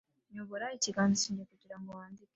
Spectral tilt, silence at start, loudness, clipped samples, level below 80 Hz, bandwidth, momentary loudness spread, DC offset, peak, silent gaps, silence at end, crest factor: -3.5 dB/octave; 0.3 s; -33 LUFS; under 0.1%; -74 dBFS; 8.2 kHz; 20 LU; under 0.1%; -18 dBFS; none; 0.2 s; 20 dB